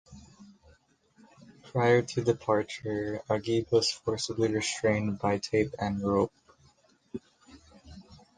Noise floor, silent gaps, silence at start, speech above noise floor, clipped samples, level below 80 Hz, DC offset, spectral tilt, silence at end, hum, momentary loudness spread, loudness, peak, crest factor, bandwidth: -64 dBFS; none; 0.1 s; 36 dB; under 0.1%; -58 dBFS; under 0.1%; -5 dB/octave; 0.2 s; none; 9 LU; -29 LUFS; -10 dBFS; 20 dB; 10 kHz